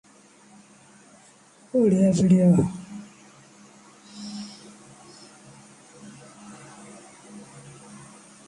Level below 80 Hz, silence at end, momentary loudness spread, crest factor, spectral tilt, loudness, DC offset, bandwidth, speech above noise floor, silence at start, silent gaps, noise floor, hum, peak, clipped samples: -58 dBFS; 1.05 s; 28 LU; 20 dB; -7.5 dB/octave; -21 LUFS; under 0.1%; 11 kHz; 36 dB; 1.75 s; none; -54 dBFS; none; -8 dBFS; under 0.1%